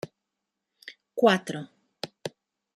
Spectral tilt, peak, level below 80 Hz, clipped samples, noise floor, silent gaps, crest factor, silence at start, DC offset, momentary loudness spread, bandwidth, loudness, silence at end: -5 dB/octave; -6 dBFS; -78 dBFS; under 0.1%; -84 dBFS; none; 24 dB; 0.05 s; under 0.1%; 24 LU; 13.5 kHz; -26 LUFS; 0.5 s